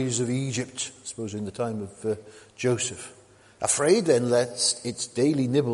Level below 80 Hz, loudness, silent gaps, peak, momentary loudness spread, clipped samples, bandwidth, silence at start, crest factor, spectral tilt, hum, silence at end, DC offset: -64 dBFS; -26 LUFS; none; -8 dBFS; 12 LU; under 0.1%; 11.5 kHz; 0 s; 18 dB; -4 dB/octave; none; 0 s; under 0.1%